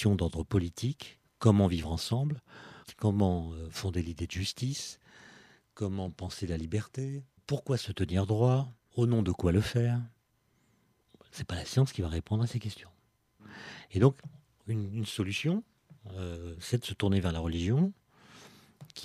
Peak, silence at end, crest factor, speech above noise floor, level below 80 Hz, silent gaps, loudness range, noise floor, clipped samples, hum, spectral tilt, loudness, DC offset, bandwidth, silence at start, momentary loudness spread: -8 dBFS; 0 s; 22 dB; 42 dB; -50 dBFS; none; 6 LU; -72 dBFS; under 0.1%; none; -6.5 dB/octave; -32 LUFS; under 0.1%; 14 kHz; 0 s; 19 LU